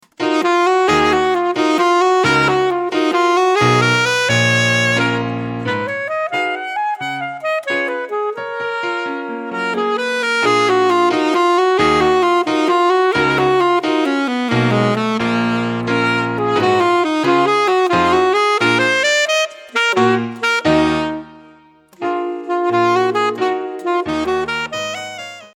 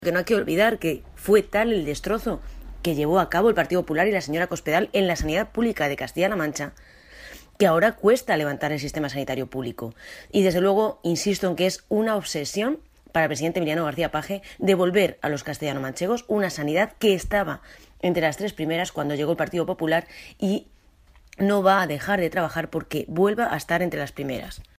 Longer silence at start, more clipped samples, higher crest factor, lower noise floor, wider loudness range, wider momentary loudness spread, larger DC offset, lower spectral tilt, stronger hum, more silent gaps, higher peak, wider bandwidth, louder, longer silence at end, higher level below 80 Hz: first, 0.2 s vs 0 s; neither; about the same, 14 dB vs 18 dB; second, -47 dBFS vs -54 dBFS; first, 6 LU vs 2 LU; about the same, 9 LU vs 11 LU; neither; about the same, -4.5 dB/octave vs -5 dB/octave; neither; neither; first, 0 dBFS vs -6 dBFS; second, 12.5 kHz vs 15.5 kHz; first, -16 LUFS vs -24 LUFS; about the same, 0.1 s vs 0.15 s; about the same, -50 dBFS vs -46 dBFS